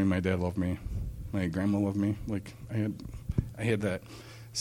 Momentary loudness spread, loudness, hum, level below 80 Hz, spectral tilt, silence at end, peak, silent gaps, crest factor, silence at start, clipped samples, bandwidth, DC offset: 10 LU; -32 LUFS; none; -44 dBFS; -6.5 dB/octave; 0 s; -14 dBFS; none; 18 dB; 0 s; under 0.1%; 16 kHz; under 0.1%